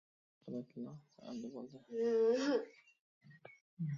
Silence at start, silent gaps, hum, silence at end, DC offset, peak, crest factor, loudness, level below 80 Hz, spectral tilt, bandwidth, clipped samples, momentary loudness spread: 0.45 s; 3.00-3.21 s, 3.61-3.77 s; none; 0 s; under 0.1%; -24 dBFS; 16 dB; -39 LUFS; -86 dBFS; -6 dB/octave; 7.4 kHz; under 0.1%; 27 LU